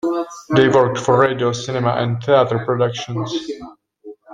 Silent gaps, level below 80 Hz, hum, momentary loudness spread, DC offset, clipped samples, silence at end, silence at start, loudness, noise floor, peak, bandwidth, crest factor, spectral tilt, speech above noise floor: none; -56 dBFS; none; 11 LU; under 0.1%; under 0.1%; 0 s; 0.05 s; -17 LUFS; -41 dBFS; -2 dBFS; 9.6 kHz; 16 dB; -6 dB/octave; 24 dB